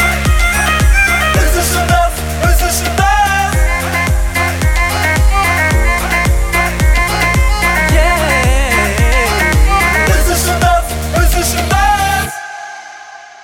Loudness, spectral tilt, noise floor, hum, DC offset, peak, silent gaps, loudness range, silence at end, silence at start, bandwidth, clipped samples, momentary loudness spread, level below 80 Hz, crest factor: -12 LUFS; -4 dB/octave; -33 dBFS; none; under 0.1%; 0 dBFS; none; 2 LU; 0.05 s; 0 s; 17.5 kHz; under 0.1%; 4 LU; -14 dBFS; 10 dB